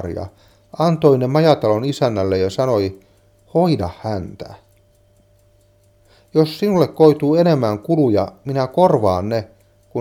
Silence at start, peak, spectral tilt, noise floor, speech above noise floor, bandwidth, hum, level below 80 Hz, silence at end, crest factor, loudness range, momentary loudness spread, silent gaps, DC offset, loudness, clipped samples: 0 s; 0 dBFS; -7.5 dB/octave; -54 dBFS; 38 dB; 16 kHz; none; -52 dBFS; 0 s; 18 dB; 8 LU; 14 LU; none; under 0.1%; -17 LUFS; under 0.1%